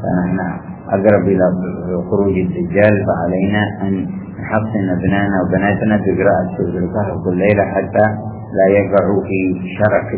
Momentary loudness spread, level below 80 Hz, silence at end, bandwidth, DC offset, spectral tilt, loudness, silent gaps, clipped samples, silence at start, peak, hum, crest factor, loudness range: 8 LU; -38 dBFS; 0 s; 4 kHz; under 0.1%; -12 dB/octave; -16 LUFS; none; under 0.1%; 0 s; 0 dBFS; none; 14 dB; 1 LU